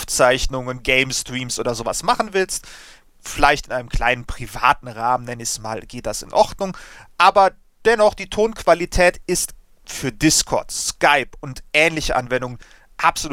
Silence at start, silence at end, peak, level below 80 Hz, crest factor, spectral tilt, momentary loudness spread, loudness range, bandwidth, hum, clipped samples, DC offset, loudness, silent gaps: 0 s; 0 s; 0 dBFS; -34 dBFS; 20 dB; -3 dB/octave; 12 LU; 4 LU; 17 kHz; none; under 0.1%; under 0.1%; -19 LUFS; none